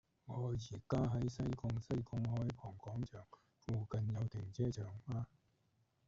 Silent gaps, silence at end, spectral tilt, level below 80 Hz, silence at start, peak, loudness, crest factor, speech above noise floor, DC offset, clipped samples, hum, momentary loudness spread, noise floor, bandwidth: none; 0.8 s; -8.5 dB/octave; -60 dBFS; 0.25 s; -24 dBFS; -43 LUFS; 18 dB; 38 dB; under 0.1%; under 0.1%; none; 10 LU; -79 dBFS; 7.6 kHz